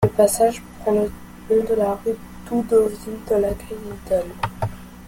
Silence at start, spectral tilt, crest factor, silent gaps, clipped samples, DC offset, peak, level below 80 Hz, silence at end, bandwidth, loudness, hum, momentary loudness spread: 0 s; -6 dB/octave; 18 dB; none; under 0.1%; under 0.1%; -4 dBFS; -42 dBFS; 0 s; 17 kHz; -22 LUFS; none; 14 LU